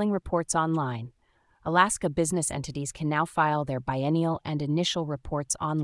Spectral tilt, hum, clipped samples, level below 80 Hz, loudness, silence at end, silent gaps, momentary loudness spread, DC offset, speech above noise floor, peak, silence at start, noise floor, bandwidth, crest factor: -4.5 dB/octave; none; under 0.1%; -52 dBFS; -27 LUFS; 0 s; none; 9 LU; under 0.1%; 30 dB; -8 dBFS; 0 s; -57 dBFS; 12 kHz; 20 dB